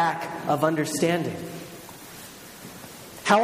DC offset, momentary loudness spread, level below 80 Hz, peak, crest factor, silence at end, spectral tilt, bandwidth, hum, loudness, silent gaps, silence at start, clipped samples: under 0.1%; 18 LU; -64 dBFS; -4 dBFS; 22 dB; 0 s; -4.5 dB/octave; 15.5 kHz; none; -26 LUFS; none; 0 s; under 0.1%